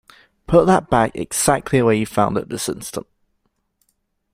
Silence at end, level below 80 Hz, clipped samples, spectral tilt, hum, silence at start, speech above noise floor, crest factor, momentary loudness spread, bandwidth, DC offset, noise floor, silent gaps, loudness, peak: 1.35 s; -42 dBFS; under 0.1%; -5 dB/octave; none; 0.5 s; 52 dB; 18 dB; 12 LU; 16 kHz; under 0.1%; -69 dBFS; none; -18 LUFS; -2 dBFS